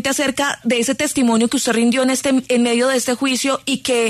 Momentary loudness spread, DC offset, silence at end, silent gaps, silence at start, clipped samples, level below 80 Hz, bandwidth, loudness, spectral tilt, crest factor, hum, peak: 3 LU; under 0.1%; 0 s; none; 0 s; under 0.1%; -56 dBFS; 13.5 kHz; -17 LUFS; -2.5 dB/octave; 12 dB; none; -6 dBFS